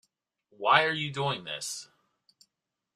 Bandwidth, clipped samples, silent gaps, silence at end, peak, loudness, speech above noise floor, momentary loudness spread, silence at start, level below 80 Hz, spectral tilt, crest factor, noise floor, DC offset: 14.5 kHz; under 0.1%; none; 1.1 s; -6 dBFS; -28 LUFS; 57 dB; 13 LU; 0.6 s; -74 dBFS; -3 dB/octave; 26 dB; -85 dBFS; under 0.1%